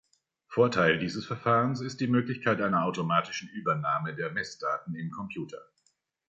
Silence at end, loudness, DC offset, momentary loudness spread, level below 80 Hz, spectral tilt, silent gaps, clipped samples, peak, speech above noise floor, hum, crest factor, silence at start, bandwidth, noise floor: 0.65 s; -29 LUFS; under 0.1%; 12 LU; -66 dBFS; -6 dB/octave; none; under 0.1%; -10 dBFS; 45 dB; none; 20 dB; 0.5 s; 8 kHz; -73 dBFS